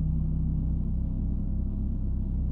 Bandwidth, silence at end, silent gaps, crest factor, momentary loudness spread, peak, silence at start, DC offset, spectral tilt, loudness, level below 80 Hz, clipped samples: 1.4 kHz; 0 s; none; 10 dB; 3 LU; -18 dBFS; 0 s; under 0.1%; -13 dB/octave; -31 LUFS; -30 dBFS; under 0.1%